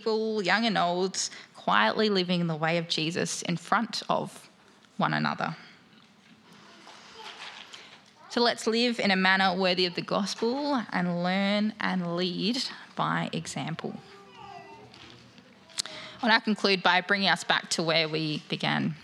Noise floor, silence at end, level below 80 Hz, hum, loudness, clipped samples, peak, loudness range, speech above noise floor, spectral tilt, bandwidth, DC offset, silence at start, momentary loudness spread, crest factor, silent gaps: -58 dBFS; 0 s; -76 dBFS; none; -27 LUFS; under 0.1%; -4 dBFS; 9 LU; 30 dB; -4 dB/octave; 13 kHz; under 0.1%; 0 s; 18 LU; 24 dB; none